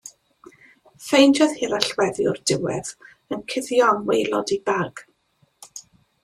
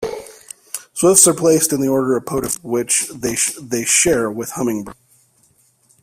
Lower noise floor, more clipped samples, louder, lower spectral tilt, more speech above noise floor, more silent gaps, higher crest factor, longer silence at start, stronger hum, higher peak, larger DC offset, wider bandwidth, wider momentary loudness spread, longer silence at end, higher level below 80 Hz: first, -65 dBFS vs -57 dBFS; neither; second, -21 LUFS vs -16 LUFS; about the same, -4 dB/octave vs -3 dB/octave; first, 44 dB vs 40 dB; neither; about the same, 22 dB vs 18 dB; about the same, 0.05 s vs 0 s; neither; about the same, 0 dBFS vs 0 dBFS; neither; second, 14 kHz vs 16 kHz; first, 24 LU vs 18 LU; second, 0.45 s vs 1.1 s; second, -62 dBFS vs -50 dBFS